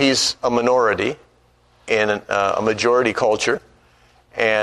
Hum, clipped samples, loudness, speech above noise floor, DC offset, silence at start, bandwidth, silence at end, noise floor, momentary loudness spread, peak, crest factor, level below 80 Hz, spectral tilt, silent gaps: 60 Hz at -50 dBFS; under 0.1%; -19 LUFS; 38 dB; under 0.1%; 0 s; 13 kHz; 0 s; -56 dBFS; 7 LU; -2 dBFS; 16 dB; -54 dBFS; -3 dB/octave; none